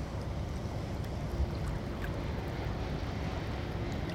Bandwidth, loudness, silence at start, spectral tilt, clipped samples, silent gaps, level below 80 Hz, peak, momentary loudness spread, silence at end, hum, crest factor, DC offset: 16 kHz; -37 LUFS; 0 s; -7 dB/octave; under 0.1%; none; -40 dBFS; -22 dBFS; 2 LU; 0 s; none; 14 dB; under 0.1%